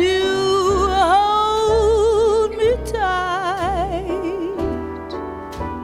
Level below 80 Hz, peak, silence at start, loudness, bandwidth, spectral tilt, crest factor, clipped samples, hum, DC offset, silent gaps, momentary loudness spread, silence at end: -34 dBFS; -4 dBFS; 0 s; -18 LUFS; 13.5 kHz; -5 dB/octave; 14 dB; under 0.1%; none; under 0.1%; none; 13 LU; 0 s